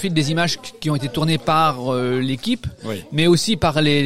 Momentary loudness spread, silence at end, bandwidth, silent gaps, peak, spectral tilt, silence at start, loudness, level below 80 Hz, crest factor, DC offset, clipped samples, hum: 8 LU; 0 s; 16 kHz; none; -4 dBFS; -5 dB/octave; 0 s; -19 LUFS; -44 dBFS; 14 dB; 1%; under 0.1%; none